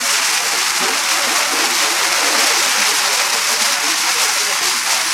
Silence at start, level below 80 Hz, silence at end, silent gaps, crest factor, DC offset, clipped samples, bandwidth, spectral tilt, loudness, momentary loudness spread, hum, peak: 0 s; -70 dBFS; 0 s; none; 14 dB; under 0.1%; under 0.1%; 16.5 kHz; 2 dB/octave; -13 LUFS; 2 LU; none; -2 dBFS